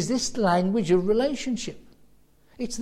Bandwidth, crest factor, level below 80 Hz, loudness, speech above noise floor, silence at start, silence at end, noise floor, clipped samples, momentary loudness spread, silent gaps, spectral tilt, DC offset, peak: 13.5 kHz; 16 dB; -50 dBFS; -25 LUFS; 34 dB; 0 s; 0 s; -58 dBFS; under 0.1%; 12 LU; none; -5 dB/octave; under 0.1%; -10 dBFS